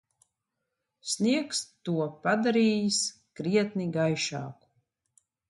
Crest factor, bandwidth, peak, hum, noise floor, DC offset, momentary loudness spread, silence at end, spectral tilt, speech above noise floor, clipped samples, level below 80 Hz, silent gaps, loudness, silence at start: 16 dB; 11.5 kHz; -12 dBFS; none; -84 dBFS; under 0.1%; 10 LU; 0.95 s; -4 dB/octave; 56 dB; under 0.1%; -74 dBFS; none; -28 LUFS; 1.05 s